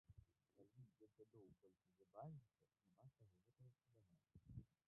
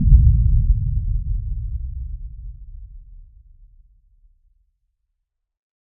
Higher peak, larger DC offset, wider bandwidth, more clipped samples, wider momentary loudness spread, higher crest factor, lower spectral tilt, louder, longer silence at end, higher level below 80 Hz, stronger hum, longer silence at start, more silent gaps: second, -46 dBFS vs 0 dBFS; neither; first, 1.8 kHz vs 0.3 kHz; neither; second, 8 LU vs 26 LU; about the same, 22 dB vs 20 dB; second, -5.5 dB/octave vs -19 dB/octave; second, -63 LUFS vs -21 LUFS; second, 0.15 s vs 2.75 s; second, -80 dBFS vs -22 dBFS; neither; about the same, 0.1 s vs 0 s; neither